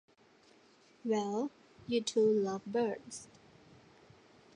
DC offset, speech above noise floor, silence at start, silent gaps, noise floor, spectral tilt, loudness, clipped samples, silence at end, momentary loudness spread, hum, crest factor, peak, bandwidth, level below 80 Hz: under 0.1%; 32 dB; 1.05 s; none; -65 dBFS; -5 dB/octave; -34 LUFS; under 0.1%; 1.3 s; 18 LU; none; 16 dB; -20 dBFS; 10.5 kHz; -78 dBFS